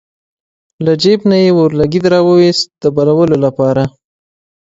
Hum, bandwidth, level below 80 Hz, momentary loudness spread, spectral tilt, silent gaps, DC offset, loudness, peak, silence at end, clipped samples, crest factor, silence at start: none; 8 kHz; -46 dBFS; 6 LU; -6.5 dB/octave; none; under 0.1%; -11 LUFS; 0 dBFS; 0.75 s; under 0.1%; 12 dB; 0.8 s